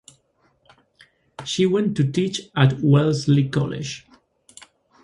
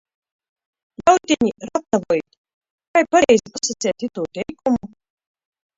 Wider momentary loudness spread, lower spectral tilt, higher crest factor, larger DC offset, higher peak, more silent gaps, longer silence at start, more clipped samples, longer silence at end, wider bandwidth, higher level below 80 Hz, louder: about the same, 13 LU vs 11 LU; first, -6.5 dB/octave vs -3.5 dB/octave; about the same, 20 dB vs 20 dB; neither; about the same, -2 dBFS vs 0 dBFS; second, none vs 2.38-2.44 s, 2.54-2.61 s, 2.70-2.78 s, 2.87-2.94 s; first, 1.4 s vs 1 s; neither; first, 1.05 s vs 0.9 s; first, 11 kHz vs 7.8 kHz; about the same, -56 dBFS vs -56 dBFS; about the same, -20 LUFS vs -19 LUFS